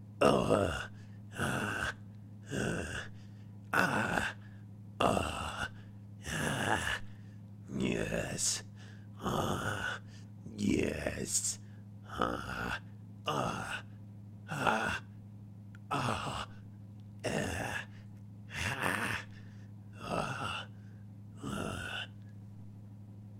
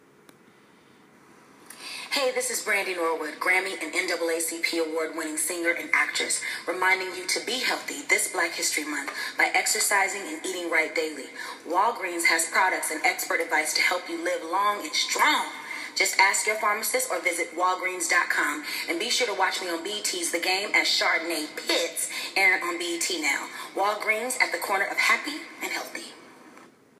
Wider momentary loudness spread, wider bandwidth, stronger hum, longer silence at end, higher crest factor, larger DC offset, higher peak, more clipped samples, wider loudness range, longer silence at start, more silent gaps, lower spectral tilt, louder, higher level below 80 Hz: first, 19 LU vs 9 LU; about the same, 16 kHz vs 15.5 kHz; neither; second, 0 s vs 0.35 s; about the same, 22 dB vs 22 dB; neither; second, -14 dBFS vs -4 dBFS; neither; about the same, 4 LU vs 3 LU; second, 0 s vs 1.7 s; neither; first, -4 dB/octave vs 0.5 dB/octave; second, -35 LUFS vs -25 LUFS; first, -54 dBFS vs -84 dBFS